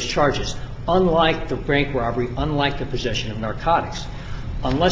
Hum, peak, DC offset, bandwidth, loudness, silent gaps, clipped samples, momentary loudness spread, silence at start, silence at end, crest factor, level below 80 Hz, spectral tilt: none; -4 dBFS; under 0.1%; 7.8 kHz; -22 LUFS; none; under 0.1%; 12 LU; 0 s; 0 s; 18 dB; -32 dBFS; -5.5 dB/octave